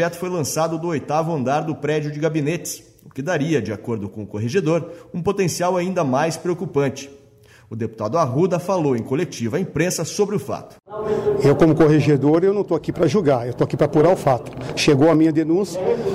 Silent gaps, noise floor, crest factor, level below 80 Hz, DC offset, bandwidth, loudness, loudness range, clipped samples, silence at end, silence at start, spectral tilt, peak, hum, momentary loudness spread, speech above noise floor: none; -49 dBFS; 14 dB; -50 dBFS; under 0.1%; 15.5 kHz; -20 LUFS; 6 LU; under 0.1%; 0 s; 0 s; -6 dB/octave; -6 dBFS; none; 13 LU; 30 dB